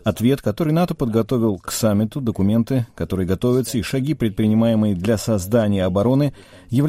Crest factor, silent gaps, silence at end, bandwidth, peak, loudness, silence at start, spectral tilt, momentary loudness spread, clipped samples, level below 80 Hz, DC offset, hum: 14 dB; none; 0 s; 16 kHz; -4 dBFS; -20 LUFS; 0.05 s; -7 dB/octave; 5 LU; under 0.1%; -44 dBFS; under 0.1%; none